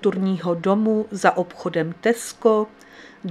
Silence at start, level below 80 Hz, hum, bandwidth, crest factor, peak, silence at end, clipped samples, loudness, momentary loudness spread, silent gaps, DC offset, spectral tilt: 0 s; -66 dBFS; none; 14 kHz; 22 dB; 0 dBFS; 0 s; under 0.1%; -22 LUFS; 6 LU; none; under 0.1%; -6 dB/octave